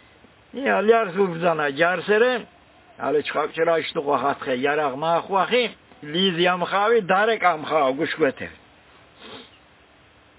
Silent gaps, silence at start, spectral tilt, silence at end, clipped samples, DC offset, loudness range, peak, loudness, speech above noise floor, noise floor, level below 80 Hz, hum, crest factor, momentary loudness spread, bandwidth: none; 0.55 s; -8.5 dB/octave; 0.95 s; under 0.1%; under 0.1%; 2 LU; -4 dBFS; -21 LUFS; 33 dB; -54 dBFS; -64 dBFS; none; 18 dB; 11 LU; 4 kHz